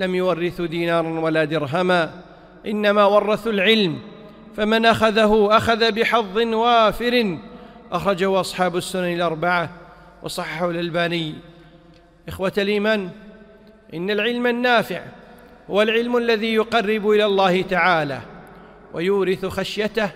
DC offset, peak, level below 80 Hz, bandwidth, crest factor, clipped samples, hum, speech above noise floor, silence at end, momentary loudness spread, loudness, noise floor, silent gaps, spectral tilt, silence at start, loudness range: under 0.1%; -2 dBFS; -48 dBFS; 16 kHz; 18 dB; under 0.1%; none; 30 dB; 0 s; 13 LU; -19 LUFS; -49 dBFS; none; -5 dB/octave; 0 s; 7 LU